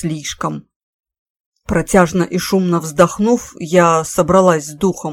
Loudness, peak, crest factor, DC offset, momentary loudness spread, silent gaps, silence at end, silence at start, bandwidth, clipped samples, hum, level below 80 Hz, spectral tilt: -15 LUFS; 0 dBFS; 16 dB; under 0.1%; 10 LU; 0.76-1.03 s, 1.19-1.52 s; 0 s; 0 s; 17 kHz; under 0.1%; none; -40 dBFS; -5.5 dB/octave